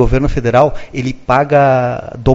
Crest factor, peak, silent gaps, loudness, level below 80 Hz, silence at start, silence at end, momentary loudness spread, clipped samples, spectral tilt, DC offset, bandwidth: 12 dB; 0 dBFS; none; -13 LUFS; -24 dBFS; 0 s; 0 s; 10 LU; under 0.1%; -7.5 dB/octave; under 0.1%; 7.8 kHz